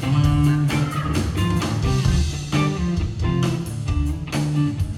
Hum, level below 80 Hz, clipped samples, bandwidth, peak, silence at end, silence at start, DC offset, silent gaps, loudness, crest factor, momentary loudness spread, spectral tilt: none; -28 dBFS; under 0.1%; 13.5 kHz; -6 dBFS; 0 s; 0 s; under 0.1%; none; -21 LUFS; 14 dB; 6 LU; -6.5 dB/octave